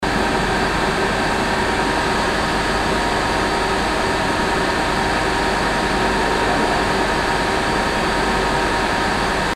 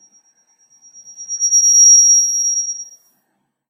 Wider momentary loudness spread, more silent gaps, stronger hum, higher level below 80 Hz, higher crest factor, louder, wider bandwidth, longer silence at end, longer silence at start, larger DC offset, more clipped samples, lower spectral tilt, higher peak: second, 1 LU vs 19 LU; neither; neither; first, -32 dBFS vs -84 dBFS; about the same, 14 dB vs 14 dB; second, -18 LUFS vs -9 LUFS; about the same, 16 kHz vs 15.5 kHz; second, 0 s vs 0.85 s; second, 0 s vs 1.2 s; neither; neither; first, -4 dB/octave vs 6.5 dB/octave; about the same, -4 dBFS vs -2 dBFS